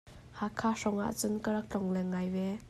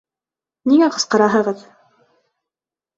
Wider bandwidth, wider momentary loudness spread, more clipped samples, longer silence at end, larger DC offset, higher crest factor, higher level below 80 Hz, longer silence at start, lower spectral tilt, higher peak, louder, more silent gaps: first, 14.5 kHz vs 8.2 kHz; second, 5 LU vs 11 LU; neither; second, 0 s vs 1.4 s; neither; about the same, 16 dB vs 18 dB; about the same, -60 dBFS vs -64 dBFS; second, 0.05 s vs 0.65 s; first, -5.5 dB/octave vs -4 dB/octave; second, -18 dBFS vs -2 dBFS; second, -34 LUFS vs -16 LUFS; neither